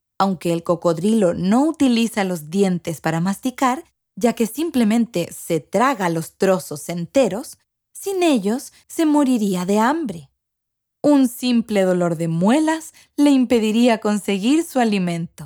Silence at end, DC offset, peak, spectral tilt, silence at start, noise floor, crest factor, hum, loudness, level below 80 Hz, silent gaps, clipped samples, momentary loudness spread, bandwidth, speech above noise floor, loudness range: 0 s; under 0.1%; -2 dBFS; -5.5 dB/octave; 0.2 s; -79 dBFS; 18 dB; none; -19 LUFS; -60 dBFS; none; under 0.1%; 8 LU; 20 kHz; 60 dB; 3 LU